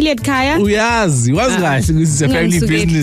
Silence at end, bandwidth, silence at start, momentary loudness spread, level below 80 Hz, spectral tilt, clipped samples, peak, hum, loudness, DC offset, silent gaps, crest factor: 0 s; 15.5 kHz; 0 s; 1 LU; -30 dBFS; -5 dB/octave; under 0.1%; -6 dBFS; none; -13 LUFS; under 0.1%; none; 8 dB